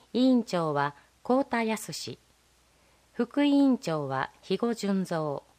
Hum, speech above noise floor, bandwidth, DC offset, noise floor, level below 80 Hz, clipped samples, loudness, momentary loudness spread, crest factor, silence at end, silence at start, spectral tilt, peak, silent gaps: none; 37 dB; 15.5 kHz; under 0.1%; -64 dBFS; -70 dBFS; under 0.1%; -28 LUFS; 13 LU; 18 dB; 0.2 s; 0.15 s; -5.5 dB/octave; -10 dBFS; none